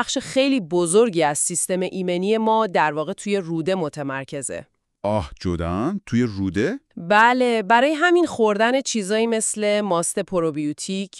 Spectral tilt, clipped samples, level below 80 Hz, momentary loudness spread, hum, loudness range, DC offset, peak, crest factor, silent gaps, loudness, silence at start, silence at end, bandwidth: -4 dB/octave; under 0.1%; -50 dBFS; 10 LU; none; 7 LU; under 0.1%; -2 dBFS; 18 dB; none; -21 LUFS; 0 s; 0 s; 13.5 kHz